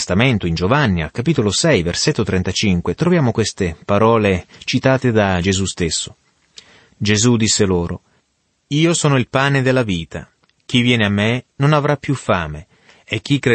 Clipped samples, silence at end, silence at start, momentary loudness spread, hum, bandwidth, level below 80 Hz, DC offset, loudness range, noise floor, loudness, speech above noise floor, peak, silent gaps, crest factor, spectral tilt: under 0.1%; 0 s; 0 s; 9 LU; none; 8.8 kHz; -42 dBFS; under 0.1%; 2 LU; -66 dBFS; -17 LUFS; 50 dB; -2 dBFS; none; 16 dB; -5 dB/octave